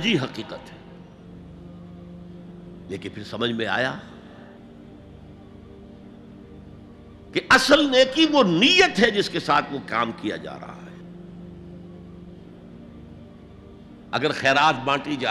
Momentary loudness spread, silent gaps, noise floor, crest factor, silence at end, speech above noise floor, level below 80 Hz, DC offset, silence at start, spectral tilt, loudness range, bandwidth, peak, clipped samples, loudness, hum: 27 LU; none; -44 dBFS; 20 dB; 0 s; 23 dB; -54 dBFS; under 0.1%; 0 s; -4 dB/octave; 19 LU; 14 kHz; -4 dBFS; under 0.1%; -20 LUFS; none